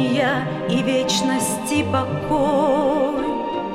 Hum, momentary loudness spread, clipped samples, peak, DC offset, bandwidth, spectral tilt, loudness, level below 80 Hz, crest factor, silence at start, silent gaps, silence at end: none; 5 LU; under 0.1%; -6 dBFS; under 0.1%; 16 kHz; -4.5 dB/octave; -20 LUFS; -46 dBFS; 14 dB; 0 s; none; 0 s